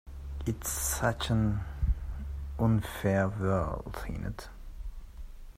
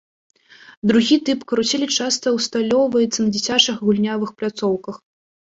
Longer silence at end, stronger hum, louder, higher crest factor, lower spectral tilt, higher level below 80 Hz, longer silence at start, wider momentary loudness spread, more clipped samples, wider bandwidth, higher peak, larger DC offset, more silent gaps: second, 0 s vs 0.65 s; neither; second, -32 LUFS vs -19 LUFS; about the same, 18 dB vs 18 dB; first, -5.5 dB/octave vs -3.5 dB/octave; first, -38 dBFS vs -60 dBFS; second, 0.05 s vs 0.7 s; first, 18 LU vs 8 LU; neither; first, 16 kHz vs 8 kHz; second, -14 dBFS vs -2 dBFS; neither; second, none vs 0.77-0.82 s